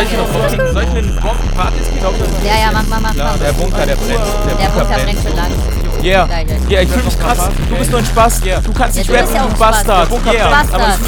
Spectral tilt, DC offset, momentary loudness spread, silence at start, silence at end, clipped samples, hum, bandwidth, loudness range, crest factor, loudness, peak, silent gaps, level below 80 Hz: -4.5 dB/octave; under 0.1%; 5 LU; 0 s; 0 s; 0.2%; none; 19.5 kHz; 3 LU; 12 dB; -13 LUFS; 0 dBFS; none; -14 dBFS